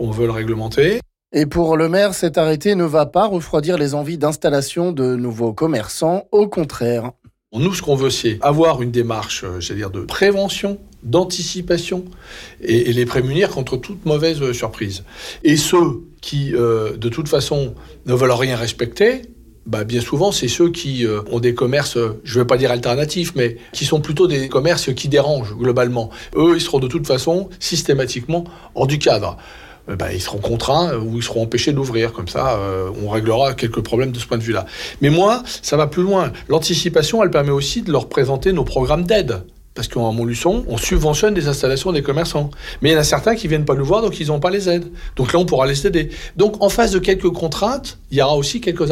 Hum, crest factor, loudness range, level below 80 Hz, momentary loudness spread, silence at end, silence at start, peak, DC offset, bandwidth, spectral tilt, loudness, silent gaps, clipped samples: none; 12 dB; 3 LU; -36 dBFS; 8 LU; 0 s; 0 s; -4 dBFS; under 0.1%; 16.5 kHz; -5 dB/octave; -18 LUFS; none; under 0.1%